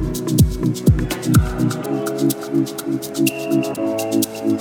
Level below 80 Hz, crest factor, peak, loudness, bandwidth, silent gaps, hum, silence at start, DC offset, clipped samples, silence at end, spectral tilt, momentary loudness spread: -30 dBFS; 16 dB; -2 dBFS; -19 LUFS; 20 kHz; none; none; 0 s; under 0.1%; under 0.1%; 0 s; -6 dB/octave; 6 LU